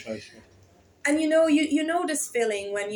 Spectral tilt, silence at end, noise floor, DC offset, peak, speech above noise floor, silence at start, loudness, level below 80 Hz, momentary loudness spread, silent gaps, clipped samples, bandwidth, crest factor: -2.5 dB/octave; 0 s; -57 dBFS; under 0.1%; -10 dBFS; 32 dB; 0 s; -24 LUFS; -68 dBFS; 9 LU; none; under 0.1%; over 20 kHz; 16 dB